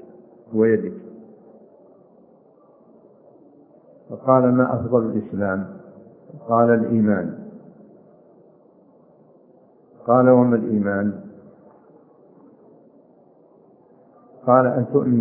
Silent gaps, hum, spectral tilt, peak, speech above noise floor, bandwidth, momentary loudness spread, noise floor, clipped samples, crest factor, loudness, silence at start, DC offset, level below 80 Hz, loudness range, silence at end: none; none; -14 dB/octave; -2 dBFS; 35 dB; 2.7 kHz; 22 LU; -53 dBFS; under 0.1%; 22 dB; -19 LUFS; 0.5 s; under 0.1%; -66 dBFS; 7 LU; 0 s